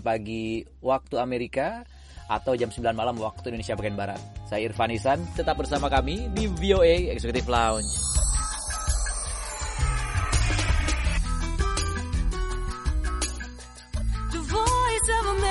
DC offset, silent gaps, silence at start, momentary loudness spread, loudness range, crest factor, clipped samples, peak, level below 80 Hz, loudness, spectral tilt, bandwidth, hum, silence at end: under 0.1%; none; 0 s; 9 LU; 5 LU; 18 dB; under 0.1%; -8 dBFS; -30 dBFS; -27 LUFS; -4 dB/octave; 11.5 kHz; none; 0 s